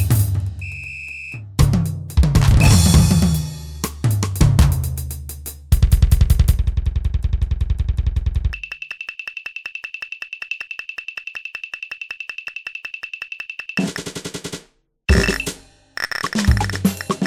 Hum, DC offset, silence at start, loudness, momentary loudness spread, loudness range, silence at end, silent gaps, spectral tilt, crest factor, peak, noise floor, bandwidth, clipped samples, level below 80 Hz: none; under 0.1%; 0 s; -20 LUFS; 14 LU; 12 LU; 0 s; none; -5 dB/octave; 18 dB; 0 dBFS; -51 dBFS; 16 kHz; under 0.1%; -22 dBFS